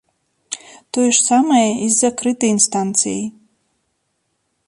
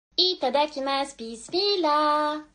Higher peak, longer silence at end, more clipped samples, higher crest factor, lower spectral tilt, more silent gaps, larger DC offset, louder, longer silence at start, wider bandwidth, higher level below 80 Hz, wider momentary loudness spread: first, 0 dBFS vs -8 dBFS; first, 1.4 s vs 0.1 s; neither; about the same, 18 dB vs 18 dB; about the same, -3 dB/octave vs -2 dB/octave; neither; neither; first, -15 LUFS vs -24 LUFS; first, 0.5 s vs 0.2 s; first, 11.5 kHz vs 10 kHz; about the same, -64 dBFS vs -64 dBFS; first, 17 LU vs 8 LU